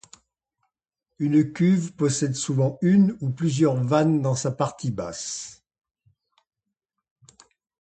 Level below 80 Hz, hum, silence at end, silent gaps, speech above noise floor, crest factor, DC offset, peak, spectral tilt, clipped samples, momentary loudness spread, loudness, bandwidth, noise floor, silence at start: -62 dBFS; none; 2.3 s; none; 61 dB; 18 dB; under 0.1%; -6 dBFS; -6.5 dB/octave; under 0.1%; 11 LU; -23 LUFS; 9.2 kHz; -83 dBFS; 1.2 s